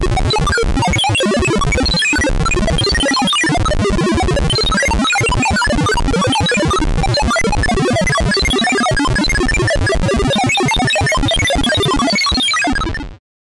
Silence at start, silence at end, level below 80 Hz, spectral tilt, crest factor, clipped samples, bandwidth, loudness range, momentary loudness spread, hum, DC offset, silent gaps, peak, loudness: 0 s; 0.3 s; -22 dBFS; -4 dB/octave; 6 dB; under 0.1%; 11.5 kHz; 1 LU; 3 LU; none; under 0.1%; none; -8 dBFS; -14 LUFS